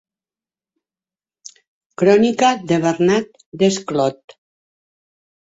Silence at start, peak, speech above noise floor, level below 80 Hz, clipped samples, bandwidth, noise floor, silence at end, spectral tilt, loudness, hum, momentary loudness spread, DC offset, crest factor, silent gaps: 2 s; -2 dBFS; over 74 dB; -60 dBFS; under 0.1%; 8 kHz; under -90 dBFS; 1.35 s; -5 dB/octave; -17 LUFS; none; 7 LU; under 0.1%; 18 dB; 3.46-3.52 s